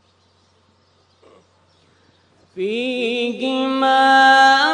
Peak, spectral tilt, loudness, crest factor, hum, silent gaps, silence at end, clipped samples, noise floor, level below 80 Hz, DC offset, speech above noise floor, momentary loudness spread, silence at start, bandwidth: -2 dBFS; -2.5 dB/octave; -15 LUFS; 16 dB; none; none; 0 s; under 0.1%; -58 dBFS; -74 dBFS; under 0.1%; 43 dB; 12 LU; 2.55 s; 10 kHz